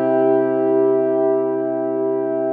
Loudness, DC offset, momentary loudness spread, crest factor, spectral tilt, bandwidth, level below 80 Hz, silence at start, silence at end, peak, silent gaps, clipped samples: -18 LUFS; under 0.1%; 5 LU; 10 dB; -11.5 dB/octave; 3.3 kHz; -80 dBFS; 0 s; 0 s; -6 dBFS; none; under 0.1%